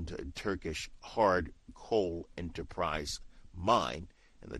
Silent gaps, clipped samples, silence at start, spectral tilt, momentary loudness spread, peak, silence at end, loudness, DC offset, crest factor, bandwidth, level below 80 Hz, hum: none; under 0.1%; 0 s; -4.5 dB/octave; 15 LU; -12 dBFS; 0 s; -34 LUFS; under 0.1%; 22 dB; 12.5 kHz; -50 dBFS; none